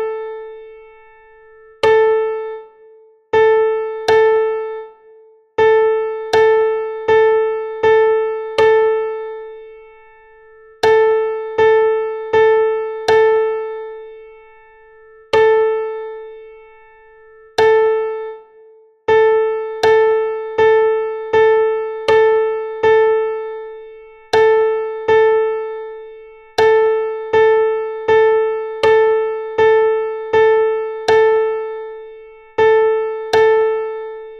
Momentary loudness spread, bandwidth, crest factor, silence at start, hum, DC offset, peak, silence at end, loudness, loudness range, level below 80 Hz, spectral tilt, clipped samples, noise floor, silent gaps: 15 LU; 7.2 kHz; 14 dB; 0 s; none; under 0.1%; -2 dBFS; 0 s; -15 LUFS; 4 LU; -54 dBFS; -4 dB/octave; under 0.1%; -46 dBFS; none